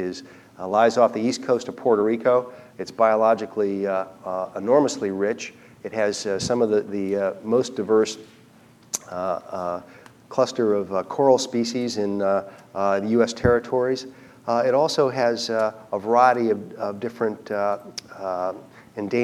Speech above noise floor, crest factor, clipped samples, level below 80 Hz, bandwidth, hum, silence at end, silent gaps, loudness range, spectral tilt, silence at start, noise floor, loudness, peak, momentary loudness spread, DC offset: 29 dB; 20 dB; under 0.1%; -54 dBFS; 14 kHz; none; 0 s; none; 3 LU; -5 dB/octave; 0 s; -52 dBFS; -23 LUFS; -4 dBFS; 13 LU; under 0.1%